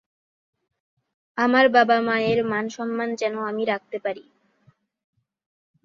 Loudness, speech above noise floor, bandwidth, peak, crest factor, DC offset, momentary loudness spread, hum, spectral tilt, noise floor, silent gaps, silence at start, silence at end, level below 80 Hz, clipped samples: -22 LUFS; 40 dB; 7.6 kHz; -4 dBFS; 22 dB; under 0.1%; 14 LU; none; -5 dB/octave; -62 dBFS; none; 1.35 s; 1.65 s; -70 dBFS; under 0.1%